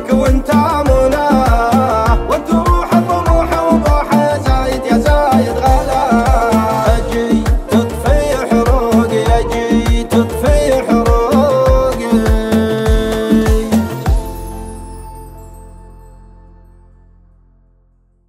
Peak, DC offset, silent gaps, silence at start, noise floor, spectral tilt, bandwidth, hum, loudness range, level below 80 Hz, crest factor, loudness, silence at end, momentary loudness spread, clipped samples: 0 dBFS; under 0.1%; none; 0 s; -53 dBFS; -6.5 dB/octave; 16 kHz; none; 5 LU; -18 dBFS; 12 dB; -13 LUFS; 2.2 s; 4 LU; under 0.1%